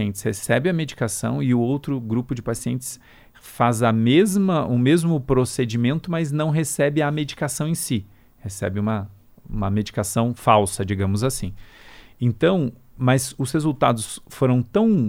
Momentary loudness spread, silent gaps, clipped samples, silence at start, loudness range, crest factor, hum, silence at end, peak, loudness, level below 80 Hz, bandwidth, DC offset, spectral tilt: 10 LU; none; under 0.1%; 0 s; 4 LU; 18 dB; none; 0 s; -4 dBFS; -22 LUFS; -46 dBFS; 16.5 kHz; under 0.1%; -6 dB/octave